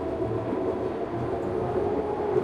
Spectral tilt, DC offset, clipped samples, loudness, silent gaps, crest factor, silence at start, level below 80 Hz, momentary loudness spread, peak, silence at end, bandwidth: -9 dB/octave; under 0.1%; under 0.1%; -29 LUFS; none; 16 dB; 0 s; -48 dBFS; 3 LU; -12 dBFS; 0 s; 9.6 kHz